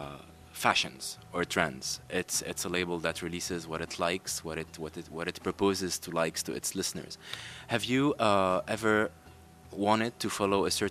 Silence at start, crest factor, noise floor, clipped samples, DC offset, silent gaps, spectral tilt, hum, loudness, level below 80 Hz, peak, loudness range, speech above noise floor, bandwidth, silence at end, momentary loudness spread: 0 s; 24 dB; -53 dBFS; under 0.1%; under 0.1%; none; -3.5 dB/octave; none; -31 LUFS; -60 dBFS; -8 dBFS; 4 LU; 22 dB; 14.5 kHz; 0 s; 13 LU